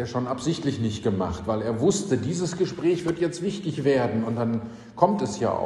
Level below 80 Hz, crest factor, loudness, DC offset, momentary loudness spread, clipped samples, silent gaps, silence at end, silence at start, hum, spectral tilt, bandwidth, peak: -50 dBFS; 20 dB; -25 LUFS; under 0.1%; 5 LU; under 0.1%; none; 0 s; 0 s; none; -6 dB/octave; 12 kHz; -4 dBFS